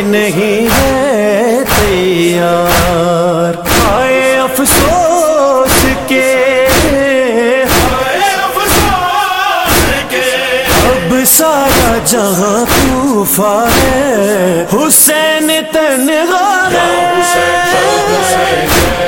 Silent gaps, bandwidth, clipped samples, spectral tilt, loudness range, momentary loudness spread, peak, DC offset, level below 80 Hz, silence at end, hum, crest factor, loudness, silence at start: none; 17.5 kHz; 0.1%; -3.5 dB/octave; 1 LU; 3 LU; 0 dBFS; under 0.1%; -26 dBFS; 0 s; none; 10 dB; -9 LUFS; 0 s